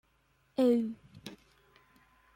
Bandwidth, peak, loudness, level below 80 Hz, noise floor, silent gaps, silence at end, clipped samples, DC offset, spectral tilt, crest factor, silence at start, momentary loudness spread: 15.5 kHz; -16 dBFS; -31 LUFS; -72 dBFS; -71 dBFS; none; 1 s; under 0.1%; under 0.1%; -6.5 dB/octave; 18 dB; 0.6 s; 22 LU